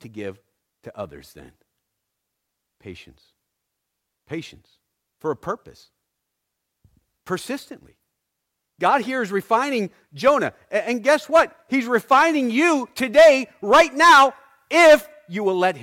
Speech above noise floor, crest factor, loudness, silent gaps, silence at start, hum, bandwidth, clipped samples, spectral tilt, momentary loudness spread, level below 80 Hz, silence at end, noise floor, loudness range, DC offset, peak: 60 dB; 16 dB; -18 LUFS; none; 0.05 s; none; 16.5 kHz; under 0.1%; -3.5 dB/octave; 21 LU; -58 dBFS; 0 s; -79 dBFS; 20 LU; under 0.1%; -4 dBFS